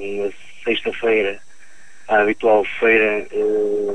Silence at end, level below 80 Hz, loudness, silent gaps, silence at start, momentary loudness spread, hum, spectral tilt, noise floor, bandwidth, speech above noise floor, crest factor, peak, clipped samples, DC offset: 0 s; -54 dBFS; -18 LUFS; none; 0 s; 11 LU; none; -5 dB/octave; -49 dBFS; 10 kHz; 31 dB; 16 dB; -4 dBFS; under 0.1%; 2%